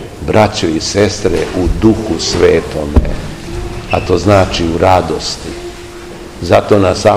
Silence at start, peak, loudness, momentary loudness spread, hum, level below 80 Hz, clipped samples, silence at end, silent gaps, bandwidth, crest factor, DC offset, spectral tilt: 0 s; 0 dBFS; -12 LUFS; 14 LU; none; -24 dBFS; 1%; 0 s; none; 15.5 kHz; 12 dB; 0.6%; -5.5 dB/octave